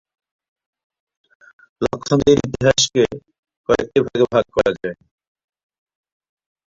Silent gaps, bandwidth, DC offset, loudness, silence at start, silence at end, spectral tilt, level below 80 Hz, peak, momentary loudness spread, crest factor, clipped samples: 3.39-3.43 s, 3.57-3.64 s; 7.8 kHz; under 0.1%; -18 LUFS; 1.8 s; 1.75 s; -4.5 dB/octave; -46 dBFS; -2 dBFS; 12 LU; 20 dB; under 0.1%